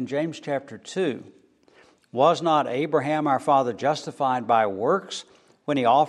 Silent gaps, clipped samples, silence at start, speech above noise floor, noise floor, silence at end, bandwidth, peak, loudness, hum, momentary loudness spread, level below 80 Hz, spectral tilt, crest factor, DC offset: none; under 0.1%; 0 s; 34 dB; -57 dBFS; 0 s; 11.5 kHz; -6 dBFS; -24 LUFS; none; 13 LU; -76 dBFS; -5.5 dB/octave; 16 dB; under 0.1%